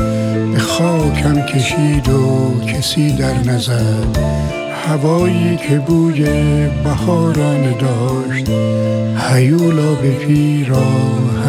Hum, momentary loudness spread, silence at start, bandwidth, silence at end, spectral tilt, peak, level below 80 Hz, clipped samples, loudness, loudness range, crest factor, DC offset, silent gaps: none; 4 LU; 0 s; 15 kHz; 0 s; -6.5 dB/octave; 0 dBFS; -30 dBFS; under 0.1%; -14 LUFS; 1 LU; 12 dB; under 0.1%; none